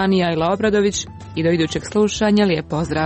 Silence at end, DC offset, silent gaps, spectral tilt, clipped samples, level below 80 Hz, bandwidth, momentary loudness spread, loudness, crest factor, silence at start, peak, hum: 0 s; under 0.1%; none; -5 dB/octave; under 0.1%; -42 dBFS; 8.6 kHz; 6 LU; -18 LUFS; 12 dB; 0 s; -6 dBFS; none